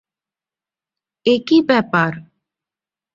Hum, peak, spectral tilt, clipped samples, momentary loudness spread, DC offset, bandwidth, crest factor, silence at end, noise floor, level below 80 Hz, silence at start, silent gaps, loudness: none; -2 dBFS; -6.5 dB/octave; under 0.1%; 8 LU; under 0.1%; 7.4 kHz; 18 dB; 0.95 s; -90 dBFS; -62 dBFS; 1.25 s; none; -16 LUFS